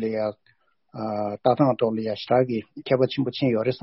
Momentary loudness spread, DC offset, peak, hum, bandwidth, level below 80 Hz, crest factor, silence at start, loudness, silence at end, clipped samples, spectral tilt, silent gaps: 10 LU; under 0.1%; -6 dBFS; none; 5.8 kHz; -64 dBFS; 18 dB; 0 s; -24 LUFS; 0.05 s; under 0.1%; -6 dB/octave; none